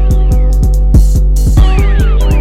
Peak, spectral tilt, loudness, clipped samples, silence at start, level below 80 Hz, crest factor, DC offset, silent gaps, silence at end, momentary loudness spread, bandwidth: 0 dBFS; -7 dB/octave; -11 LUFS; under 0.1%; 0 s; -8 dBFS; 6 dB; 2%; none; 0 s; 2 LU; 13.5 kHz